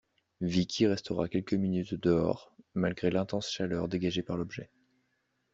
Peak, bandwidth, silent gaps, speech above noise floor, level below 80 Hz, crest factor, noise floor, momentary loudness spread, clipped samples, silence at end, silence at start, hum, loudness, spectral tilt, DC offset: -14 dBFS; 7.8 kHz; none; 47 dB; -60 dBFS; 18 dB; -77 dBFS; 9 LU; under 0.1%; 0.9 s; 0.4 s; none; -32 LUFS; -6 dB/octave; under 0.1%